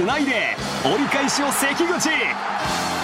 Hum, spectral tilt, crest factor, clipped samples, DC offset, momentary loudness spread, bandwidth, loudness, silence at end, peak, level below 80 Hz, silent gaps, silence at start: none; -2.5 dB/octave; 16 dB; under 0.1%; under 0.1%; 4 LU; 16.5 kHz; -20 LUFS; 0 s; -6 dBFS; -50 dBFS; none; 0 s